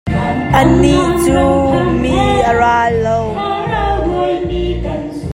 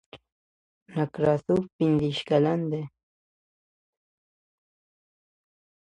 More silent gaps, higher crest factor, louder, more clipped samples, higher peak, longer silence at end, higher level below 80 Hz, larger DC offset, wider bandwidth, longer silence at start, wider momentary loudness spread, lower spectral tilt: second, none vs 0.32-0.86 s, 1.73-1.79 s; second, 12 dB vs 20 dB; first, -13 LUFS vs -26 LUFS; neither; first, 0 dBFS vs -10 dBFS; second, 0 s vs 3.05 s; first, -26 dBFS vs -62 dBFS; neither; first, 16 kHz vs 10.5 kHz; about the same, 0.05 s vs 0.15 s; about the same, 8 LU vs 10 LU; second, -6.5 dB/octave vs -8 dB/octave